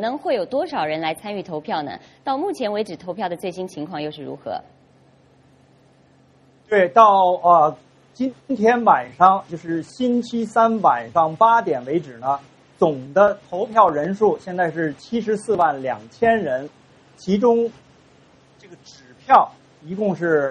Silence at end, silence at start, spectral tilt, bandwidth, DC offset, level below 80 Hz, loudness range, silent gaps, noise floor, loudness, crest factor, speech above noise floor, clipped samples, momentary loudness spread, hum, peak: 0 s; 0 s; -6.5 dB/octave; 11.5 kHz; under 0.1%; -62 dBFS; 10 LU; none; -54 dBFS; -20 LUFS; 20 dB; 35 dB; under 0.1%; 14 LU; none; 0 dBFS